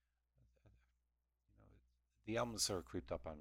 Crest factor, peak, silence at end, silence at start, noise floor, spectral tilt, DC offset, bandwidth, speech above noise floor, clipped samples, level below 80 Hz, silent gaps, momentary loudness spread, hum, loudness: 24 dB; -24 dBFS; 0 s; 0.65 s; -87 dBFS; -3 dB/octave; under 0.1%; 17 kHz; 44 dB; under 0.1%; -64 dBFS; none; 9 LU; none; -43 LUFS